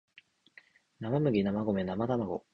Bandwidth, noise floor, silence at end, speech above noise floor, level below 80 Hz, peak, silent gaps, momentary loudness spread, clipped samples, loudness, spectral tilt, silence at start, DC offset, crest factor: 6 kHz; -61 dBFS; 0.15 s; 31 dB; -60 dBFS; -16 dBFS; none; 5 LU; under 0.1%; -31 LUFS; -9.5 dB/octave; 1 s; under 0.1%; 16 dB